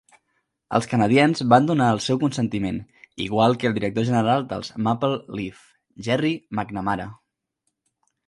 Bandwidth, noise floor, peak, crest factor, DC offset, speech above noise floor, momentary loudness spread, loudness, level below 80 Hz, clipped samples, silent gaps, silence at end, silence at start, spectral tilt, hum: 11.5 kHz; -77 dBFS; -2 dBFS; 22 dB; under 0.1%; 55 dB; 15 LU; -22 LUFS; -54 dBFS; under 0.1%; none; 1.15 s; 0.7 s; -6 dB/octave; none